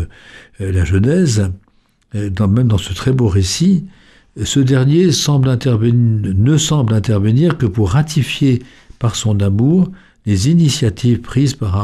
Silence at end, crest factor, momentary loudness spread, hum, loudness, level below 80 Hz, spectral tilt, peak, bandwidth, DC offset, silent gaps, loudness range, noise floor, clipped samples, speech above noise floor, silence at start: 0 s; 12 dB; 8 LU; none; -14 LUFS; -36 dBFS; -6 dB/octave; -2 dBFS; 13.5 kHz; under 0.1%; none; 3 LU; -48 dBFS; under 0.1%; 34 dB; 0 s